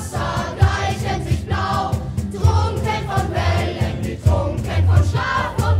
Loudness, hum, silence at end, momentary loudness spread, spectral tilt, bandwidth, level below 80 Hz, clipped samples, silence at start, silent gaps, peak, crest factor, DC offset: -20 LUFS; none; 0 s; 6 LU; -6 dB/octave; 14 kHz; -28 dBFS; under 0.1%; 0 s; none; -2 dBFS; 18 dB; under 0.1%